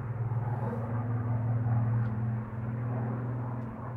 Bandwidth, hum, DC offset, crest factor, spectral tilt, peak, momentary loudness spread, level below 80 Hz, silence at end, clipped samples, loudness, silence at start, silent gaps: 2.8 kHz; none; under 0.1%; 12 dB; -11.5 dB/octave; -20 dBFS; 6 LU; -54 dBFS; 0 s; under 0.1%; -33 LUFS; 0 s; none